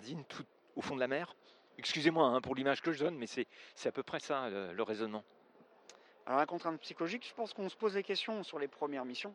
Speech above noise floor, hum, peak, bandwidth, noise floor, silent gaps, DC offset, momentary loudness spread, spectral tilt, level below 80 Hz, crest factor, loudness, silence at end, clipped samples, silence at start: 27 dB; none; -16 dBFS; 11 kHz; -64 dBFS; none; under 0.1%; 14 LU; -4.5 dB/octave; -80 dBFS; 22 dB; -37 LUFS; 0 s; under 0.1%; 0 s